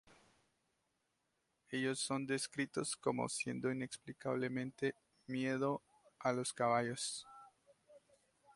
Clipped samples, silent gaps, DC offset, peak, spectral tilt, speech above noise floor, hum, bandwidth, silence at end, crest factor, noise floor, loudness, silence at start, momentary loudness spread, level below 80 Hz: under 0.1%; none; under 0.1%; -20 dBFS; -4 dB/octave; 45 dB; none; 11.5 kHz; 0.6 s; 22 dB; -84 dBFS; -40 LUFS; 0.1 s; 9 LU; -80 dBFS